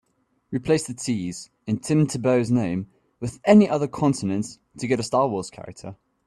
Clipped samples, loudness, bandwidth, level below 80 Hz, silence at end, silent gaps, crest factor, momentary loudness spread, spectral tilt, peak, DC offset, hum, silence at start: under 0.1%; -23 LUFS; 12 kHz; -58 dBFS; 0.3 s; none; 20 dB; 19 LU; -6.5 dB/octave; -2 dBFS; under 0.1%; none; 0.5 s